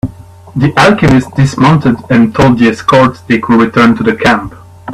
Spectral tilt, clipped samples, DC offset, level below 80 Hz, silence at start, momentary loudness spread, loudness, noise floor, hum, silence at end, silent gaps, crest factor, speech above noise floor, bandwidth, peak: -6.5 dB/octave; 0.2%; under 0.1%; -36 dBFS; 0.05 s; 7 LU; -8 LUFS; -31 dBFS; none; 0 s; none; 8 dB; 23 dB; 12.5 kHz; 0 dBFS